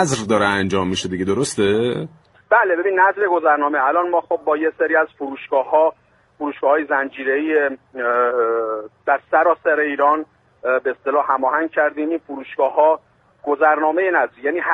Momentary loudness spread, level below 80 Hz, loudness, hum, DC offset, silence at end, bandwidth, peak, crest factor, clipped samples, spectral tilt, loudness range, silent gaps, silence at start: 9 LU; -60 dBFS; -18 LUFS; none; under 0.1%; 0 s; 11.5 kHz; -2 dBFS; 16 dB; under 0.1%; -4.5 dB/octave; 2 LU; none; 0 s